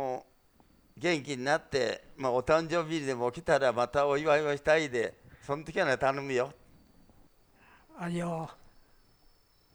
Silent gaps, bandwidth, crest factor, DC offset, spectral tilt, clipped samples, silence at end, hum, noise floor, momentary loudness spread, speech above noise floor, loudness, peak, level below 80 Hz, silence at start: none; over 20 kHz; 20 dB; under 0.1%; -5 dB/octave; under 0.1%; 1.2 s; none; -64 dBFS; 11 LU; 34 dB; -30 LUFS; -12 dBFS; -60 dBFS; 0 s